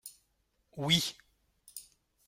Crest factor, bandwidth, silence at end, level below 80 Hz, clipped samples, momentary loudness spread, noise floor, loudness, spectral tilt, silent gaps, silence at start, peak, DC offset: 24 dB; 16.5 kHz; 0.45 s; -68 dBFS; under 0.1%; 23 LU; -76 dBFS; -30 LUFS; -3 dB/octave; none; 0.05 s; -12 dBFS; under 0.1%